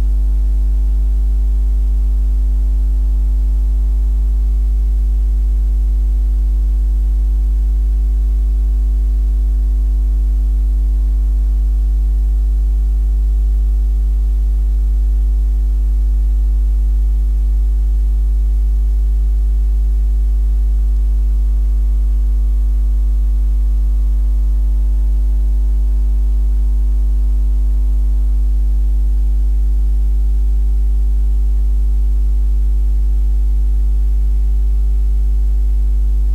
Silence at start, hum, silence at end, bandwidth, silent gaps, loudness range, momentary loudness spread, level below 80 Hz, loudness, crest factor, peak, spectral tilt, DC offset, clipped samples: 0 s; none; 0 s; 1.1 kHz; none; 0 LU; 0 LU; -12 dBFS; -17 LUFS; 4 dB; -8 dBFS; -8.5 dB/octave; under 0.1%; under 0.1%